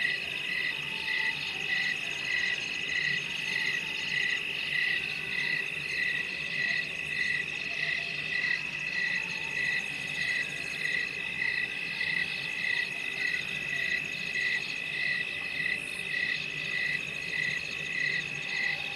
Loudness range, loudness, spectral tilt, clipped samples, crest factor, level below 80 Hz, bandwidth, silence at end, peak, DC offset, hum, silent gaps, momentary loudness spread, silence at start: 1 LU; -29 LUFS; -1.5 dB/octave; under 0.1%; 16 dB; -66 dBFS; 14 kHz; 0 s; -16 dBFS; under 0.1%; none; none; 3 LU; 0 s